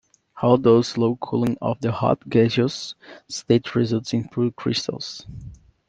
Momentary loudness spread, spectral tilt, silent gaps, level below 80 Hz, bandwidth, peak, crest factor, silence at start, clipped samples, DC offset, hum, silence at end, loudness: 15 LU; -6.5 dB/octave; none; -54 dBFS; 9.2 kHz; -2 dBFS; 20 dB; 0.35 s; under 0.1%; under 0.1%; none; 0.35 s; -22 LUFS